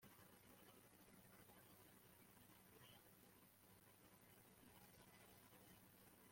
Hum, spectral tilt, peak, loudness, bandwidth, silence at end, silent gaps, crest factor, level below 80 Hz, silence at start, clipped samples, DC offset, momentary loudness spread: none; -3.5 dB/octave; -54 dBFS; -68 LUFS; 16.5 kHz; 0 s; none; 16 dB; -86 dBFS; 0 s; under 0.1%; under 0.1%; 2 LU